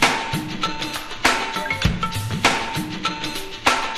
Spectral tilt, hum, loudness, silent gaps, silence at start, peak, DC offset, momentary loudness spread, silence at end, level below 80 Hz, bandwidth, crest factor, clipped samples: -3 dB/octave; none; -22 LUFS; none; 0 s; 0 dBFS; under 0.1%; 7 LU; 0 s; -38 dBFS; 16 kHz; 22 dB; under 0.1%